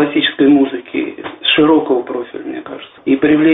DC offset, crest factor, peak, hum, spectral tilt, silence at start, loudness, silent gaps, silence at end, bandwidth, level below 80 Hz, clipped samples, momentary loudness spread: under 0.1%; 14 dB; 0 dBFS; none; -2.5 dB/octave; 0 s; -14 LUFS; none; 0 s; 4 kHz; -54 dBFS; under 0.1%; 15 LU